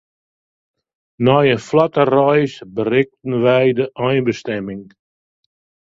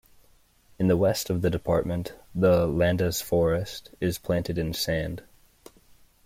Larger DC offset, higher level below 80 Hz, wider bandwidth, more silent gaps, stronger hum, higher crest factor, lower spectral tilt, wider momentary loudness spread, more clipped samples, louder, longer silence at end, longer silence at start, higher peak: neither; second, -56 dBFS vs -48 dBFS; second, 7.8 kHz vs 16.5 kHz; neither; neither; about the same, 18 dB vs 18 dB; about the same, -7 dB/octave vs -6 dB/octave; about the same, 10 LU vs 10 LU; neither; first, -16 LUFS vs -26 LUFS; about the same, 1.1 s vs 1.05 s; first, 1.2 s vs 0.8 s; first, 0 dBFS vs -10 dBFS